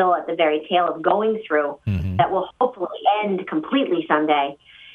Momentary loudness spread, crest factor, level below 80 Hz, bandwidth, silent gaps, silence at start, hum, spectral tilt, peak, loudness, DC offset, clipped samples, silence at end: 5 LU; 18 dB; -48 dBFS; 4.5 kHz; none; 0 s; none; -8.5 dB/octave; -4 dBFS; -21 LUFS; under 0.1%; under 0.1%; 0.05 s